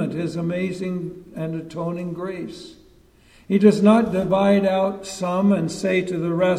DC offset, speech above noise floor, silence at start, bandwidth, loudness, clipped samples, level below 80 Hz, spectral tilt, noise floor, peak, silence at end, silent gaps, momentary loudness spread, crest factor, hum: under 0.1%; 32 dB; 0 s; 11 kHz; -21 LUFS; under 0.1%; -54 dBFS; -7 dB/octave; -53 dBFS; -2 dBFS; 0 s; none; 14 LU; 18 dB; none